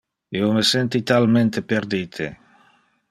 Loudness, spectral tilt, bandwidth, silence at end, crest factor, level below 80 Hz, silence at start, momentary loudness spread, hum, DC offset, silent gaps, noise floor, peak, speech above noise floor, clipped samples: -20 LUFS; -5 dB/octave; 14 kHz; 0.75 s; 18 dB; -60 dBFS; 0.3 s; 13 LU; none; under 0.1%; none; -59 dBFS; -4 dBFS; 39 dB; under 0.1%